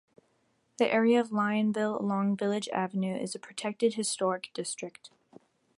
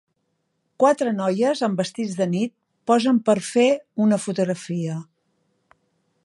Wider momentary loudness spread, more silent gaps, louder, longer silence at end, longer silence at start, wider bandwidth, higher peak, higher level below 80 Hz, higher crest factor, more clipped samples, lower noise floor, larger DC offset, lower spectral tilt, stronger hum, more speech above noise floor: about the same, 11 LU vs 9 LU; neither; second, -30 LUFS vs -22 LUFS; second, 0.7 s vs 1.2 s; about the same, 0.8 s vs 0.8 s; about the same, 11.5 kHz vs 11.5 kHz; second, -12 dBFS vs -4 dBFS; second, -78 dBFS vs -72 dBFS; about the same, 18 dB vs 18 dB; neither; about the same, -72 dBFS vs -73 dBFS; neither; about the same, -5 dB/octave vs -6 dB/octave; neither; second, 43 dB vs 52 dB